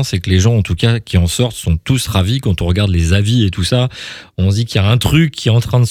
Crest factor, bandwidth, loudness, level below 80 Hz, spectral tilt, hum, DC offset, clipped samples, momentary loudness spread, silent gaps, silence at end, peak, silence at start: 14 dB; 15.5 kHz; -14 LUFS; -28 dBFS; -5.5 dB/octave; none; under 0.1%; under 0.1%; 4 LU; none; 0 s; 0 dBFS; 0 s